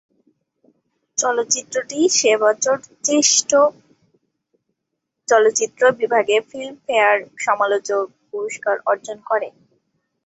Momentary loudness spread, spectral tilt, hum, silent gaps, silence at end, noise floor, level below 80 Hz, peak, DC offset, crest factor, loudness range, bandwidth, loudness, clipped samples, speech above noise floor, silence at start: 11 LU; -1 dB/octave; none; none; 0.75 s; -78 dBFS; -70 dBFS; -2 dBFS; under 0.1%; 18 dB; 3 LU; 8.2 kHz; -18 LUFS; under 0.1%; 60 dB; 1.15 s